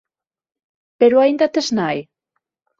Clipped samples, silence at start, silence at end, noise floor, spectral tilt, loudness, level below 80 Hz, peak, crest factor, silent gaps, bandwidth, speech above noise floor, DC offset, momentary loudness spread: under 0.1%; 1 s; 0.75 s; -76 dBFS; -5 dB/octave; -16 LUFS; -64 dBFS; -2 dBFS; 16 dB; none; 7.6 kHz; 61 dB; under 0.1%; 10 LU